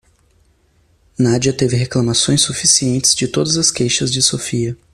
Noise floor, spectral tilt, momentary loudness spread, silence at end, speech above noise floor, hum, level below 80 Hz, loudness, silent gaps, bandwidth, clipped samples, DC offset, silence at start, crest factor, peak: -56 dBFS; -3.5 dB/octave; 7 LU; 0.2 s; 41 dB; none; -46 dBFS; -14 LUFS; none; 15 kHz; under 0.1%; under 0.1%; 1.2 s; 16 dB; 0 dBFS